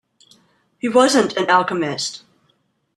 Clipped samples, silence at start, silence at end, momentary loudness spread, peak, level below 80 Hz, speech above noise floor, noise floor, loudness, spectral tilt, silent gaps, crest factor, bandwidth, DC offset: under 0.1%; 0.85 s; 0.8 s; 13 LU; -2 dBFS; -64 dBFS; 48 dB; -65 dBFS; -17 LUFS; -3.5 dB/octave; none; 18 dB; 13 kHz; under 0.1%